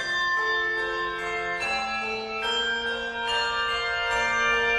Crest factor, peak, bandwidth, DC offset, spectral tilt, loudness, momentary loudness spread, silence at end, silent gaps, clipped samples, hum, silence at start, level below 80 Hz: 14 dB; -12 dBFS; 12.5 kHz; under 0.1%; -1.5 dB/octave; -25 LUFS; 6 LU; 0 s; none; under 0.1%; none; 0 s; -52 dBFS